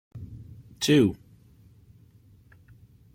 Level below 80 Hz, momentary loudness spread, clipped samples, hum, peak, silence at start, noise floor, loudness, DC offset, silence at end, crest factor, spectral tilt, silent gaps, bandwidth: -58 dBFS; 25 LU; under 0.1%; none; -8 dBFS; 0.15 s; -56 dBFS; -23 LUFS; under 0.1%; 2 s; 22 dB; -5.5 dB/octave; none; 16.5 kHz